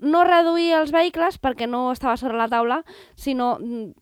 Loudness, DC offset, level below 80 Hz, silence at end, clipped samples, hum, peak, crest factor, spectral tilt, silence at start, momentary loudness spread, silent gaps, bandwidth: -21 LUFS; under 0.1%; -50 dBFS; 0.1 s; under 0.1%; none; -4 dBFS; 16 dB; -5 dB/octave; 0 s; 11 LU; none; 15.5 kHz